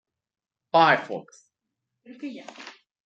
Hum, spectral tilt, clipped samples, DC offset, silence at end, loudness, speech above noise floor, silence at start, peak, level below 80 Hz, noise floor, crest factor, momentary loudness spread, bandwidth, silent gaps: none; -5 dB/octave; under 0.1%; under 0.1%; 0.35 s; -21 LUFS; 59 dB; 0.75 s; -6 dBFS; -82 dBFS; -83 dBFS; 22 dB; 24 LU; 8.2 kHz; none